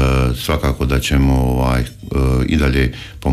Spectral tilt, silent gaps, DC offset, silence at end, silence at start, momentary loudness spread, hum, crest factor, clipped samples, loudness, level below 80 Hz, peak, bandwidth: -6.5 dB/octave; none; under 0.1%; 0 s; 0 s; 6 LU; none; 10 dB; under 0.1%; -17 LUFS; -20 dBFS; -6 dBFS; 15 kHz